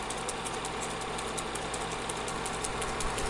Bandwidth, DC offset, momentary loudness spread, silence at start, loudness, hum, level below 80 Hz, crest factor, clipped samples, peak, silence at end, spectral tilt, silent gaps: 11.5 kHz; under 0.1%; 2 LU; 0 s; -34 LUFS; none; -46 dBFS; 20 dB; under 0.1%; -14 dBFS; 0 s; -2.5 dB/octave; none